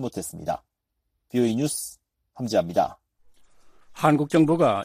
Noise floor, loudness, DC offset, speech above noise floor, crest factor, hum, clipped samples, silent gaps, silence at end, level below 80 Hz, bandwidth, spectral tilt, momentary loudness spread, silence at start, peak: -78 dBFS; -24 LUFS; under 0.1%; 55 dB; 20 dB; none; under 0.1%; none; 0 s; -60 dBFS; 15.5 kHz; -6 dB/octave; 12 LU; 0 s; -4 dBFS